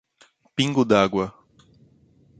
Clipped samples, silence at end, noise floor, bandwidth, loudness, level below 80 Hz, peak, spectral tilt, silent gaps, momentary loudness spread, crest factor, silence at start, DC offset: under 0.1%; 1.1 s; -59 dBFS; 9.2 kHz; -22 LUFS; -56 dBFS; -4 dBFS; -5.5 dB/octave; none; 13 LU; 22 dB; 0.55 s; under 0.1%